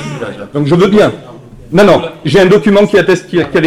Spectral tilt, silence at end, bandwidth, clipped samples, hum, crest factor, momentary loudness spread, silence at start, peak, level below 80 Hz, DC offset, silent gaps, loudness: -6.5 dB/octave; 0 s; 14 kHz; 1%; none; 10 dB; 12 LU; 0 s; 0 dBFS; -40 dBFS; under 0.1%; none; -9 LUFS